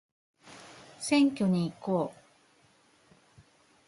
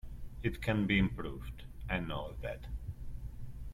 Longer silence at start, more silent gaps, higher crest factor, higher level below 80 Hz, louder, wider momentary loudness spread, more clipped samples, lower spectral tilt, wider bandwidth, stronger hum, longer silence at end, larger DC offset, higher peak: first, 0.45 s vs 0.05 s; neither; about the same, 18 dB vs 20 dB; second, -72 dBFS vs -44 dBFS; first, -29 LUFS vs -36 LUFS; first, 24 LU vs 18 LU; neither; second, -5.5 dB/octave vs -7 dB/octave; second, 11.5 kHz vs 15.5 kHz; neither; first, 1.75 s vs 0 s; neither; first, -14 dBFS vs -18 dBFS